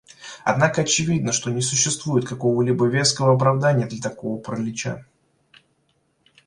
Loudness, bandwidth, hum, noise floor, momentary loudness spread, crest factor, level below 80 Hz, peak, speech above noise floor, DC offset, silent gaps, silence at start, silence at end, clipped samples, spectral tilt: -21 LUFS; 11.5 kHz; none; -67 dBFS; 11 LU; 18 dB; -56 dBFS; -4 dBFS; 46 dB; under 0.1%; none; 0.2 s; 1.45 s; under 0.1%; -4 dB/octave